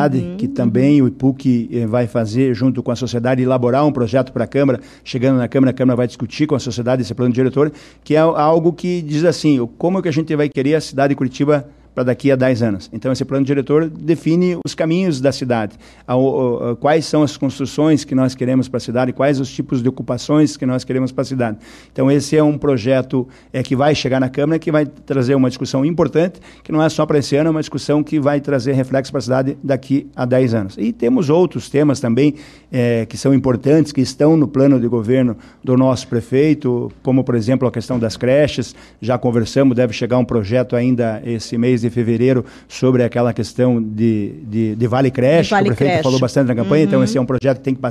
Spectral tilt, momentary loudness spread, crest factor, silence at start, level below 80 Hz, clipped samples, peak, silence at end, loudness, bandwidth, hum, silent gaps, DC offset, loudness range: -7 dB/octave; 6 LU; 12 dB; 0 s; -48 dBFS; under 0.1%; -4 dBFS; 0 s; -16 LUFS; 12 kHz; none; none; under 0.1%; 2 LU